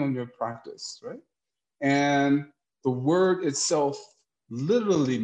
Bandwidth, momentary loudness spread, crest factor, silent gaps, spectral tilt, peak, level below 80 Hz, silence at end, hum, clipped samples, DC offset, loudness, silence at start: 9.6 kHz; 18 LU; 14 dB; none; -5 dB/octave; -12 dBFS; -72 dBFS; 0 s; none; under 0.1%; under 0.1%; -25 LUFS; 0 s